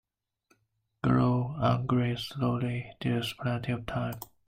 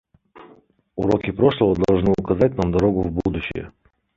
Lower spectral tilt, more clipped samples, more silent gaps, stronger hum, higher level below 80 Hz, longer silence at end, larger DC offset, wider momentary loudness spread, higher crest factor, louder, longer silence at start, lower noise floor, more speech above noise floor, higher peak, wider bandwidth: about the same, -7.5 dB/octave vs -8.5 dB/octave; neither; neither; neither; second, -54 dBFS vs -38 dBFS; second, 0.2 s vs 0.5 s; neither; second, 8 LU vs 12 LU; about the same, 18 dB vs 18 dB; second, -30 LUFS vs -20 LUFS; first, 1.05 s vs 0.35 s; first, -76 dBFS vs -53 dBFS; first, 46 dB vs 34 dB; second, -12 dBFS vs -2 dBFS; first, 16 kHz vs 7.6 kHz